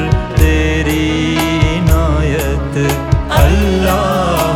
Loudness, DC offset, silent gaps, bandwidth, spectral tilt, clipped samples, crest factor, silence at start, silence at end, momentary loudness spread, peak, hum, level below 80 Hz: -13 LUFS; under 0.1%; none; 17.5 kHz; -6 dB/octave; under 0.1%; 12 dB; 0 s; 0 s; 4 LU; 0 dBFS; none; -16 dBFS